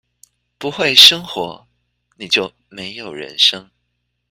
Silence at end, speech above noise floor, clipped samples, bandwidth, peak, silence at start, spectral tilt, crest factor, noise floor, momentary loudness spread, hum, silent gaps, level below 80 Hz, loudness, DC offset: 0.7 s; 55 dB; 0.4%; 16.5 kHz; 0 dBFS; 0.6 s; -1 dB/octave; 18 dB; -71 dBFS; 23 LU; 60 Hz at -55 dBFS; none; -58 dBFS; -11 LUFS; under 0.1%